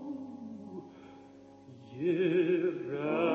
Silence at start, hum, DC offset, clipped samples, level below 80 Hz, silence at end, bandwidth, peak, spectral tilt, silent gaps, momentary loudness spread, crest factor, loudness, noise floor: 0 s; none; under 0.1%; under 0.1%; -76 dBFS; 0 s; 6.4 kHz; -18 dBFS; -8.5 dB/octave; none; 25 LU; 16 dB; -31 LUFS; -54 dBFS